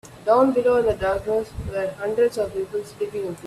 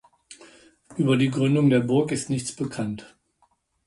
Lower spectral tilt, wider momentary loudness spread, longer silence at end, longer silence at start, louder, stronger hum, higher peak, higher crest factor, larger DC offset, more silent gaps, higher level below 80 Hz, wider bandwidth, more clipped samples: about the same, -6.5 dB/octave vs -6 dB/octave; about the same, 11 LU vs 12 LU; second, 0 s vs 0.8 s; second, 0.05 s vs 0.3 s; about the same, -22 LUFS vs -23 LUFS; neither; first, -6 dBFS vs -10 dBFS; about the same, 16 dB vs 16 dB; neither; neither; first, -44 dBFS vs -60 dBFS; first, 13.5 kHz vs 11.5 kHz; neither